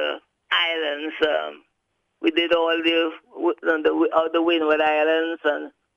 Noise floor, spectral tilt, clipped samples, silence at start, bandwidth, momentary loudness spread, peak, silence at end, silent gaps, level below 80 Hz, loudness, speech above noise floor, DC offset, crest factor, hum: -74 dBFS; -4 dB/octave; under 0.1%; 0 s; 6.8 kHz; 8 LU; -4 dBFS; 0.25 s; none; -68 dBFS; -22 LUFS; 53 dB; under 0.1%; 18 dB; none